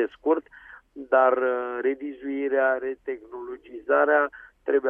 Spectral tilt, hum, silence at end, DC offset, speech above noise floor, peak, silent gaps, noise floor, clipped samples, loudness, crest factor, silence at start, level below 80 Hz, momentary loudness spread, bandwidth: -6.5 dB/octave; none; 0 s; under 0.1%; 23 dB; -8 dBFS; none; -48 dBFS; under 0.1%; -24 LUFS; 18 dB; 0 s; -66 dBFS; 17 LU; 3.6 kHz